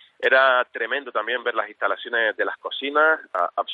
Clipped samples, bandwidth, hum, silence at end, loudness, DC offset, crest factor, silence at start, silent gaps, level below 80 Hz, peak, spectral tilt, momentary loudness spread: under 0.1%; 5.2 kHz; none; 0 s; -22 LUFS; under 0.1%; 18 dB; 0.2 s; none; -84 dBFS; -6 dBFS; -3.5 dB/octave; 9 LU